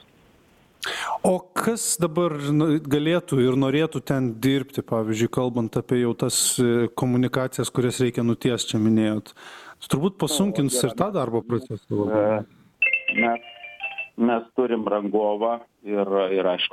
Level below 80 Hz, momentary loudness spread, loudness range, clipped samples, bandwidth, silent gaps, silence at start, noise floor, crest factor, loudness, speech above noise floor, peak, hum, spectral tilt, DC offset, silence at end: -56 dBFS; 9 LU; 2 LU; under 0.1%; 16 kHz; none; 0.8 s; -57 dBFS; 18 dB; -23 LUFS; 34 dB; -4 dBFS; none; -4.5 dB/octave; under 0.1%; 0.05 s